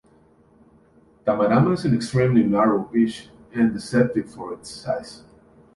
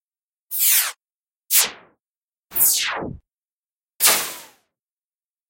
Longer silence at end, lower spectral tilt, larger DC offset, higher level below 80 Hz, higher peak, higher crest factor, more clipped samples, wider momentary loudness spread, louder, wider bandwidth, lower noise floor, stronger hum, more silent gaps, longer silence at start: second, 0.6 s vs 1.05 s; first, -7.5 dB/octave vs 1 dB/octave; neither; about the same, -54 dBFS vs -58 dBFS; second, -6 dBFS vs -2 dBFS; about the same, 18 dB vs 22 dB; neither; about the same, 16 LU vs 14 LU; second, -21 LUFS vs -17 LUFS; second, 11.5 kHz vs 16.5 kHz; second, -56 dBFS vs under -90 dBFS; neither; second, none vs 1.12-1.16 s, 2.09-2.28 s, 2.38-2.43 s, 3.52-3.63 s; first, 1.25 s vs 0.5 s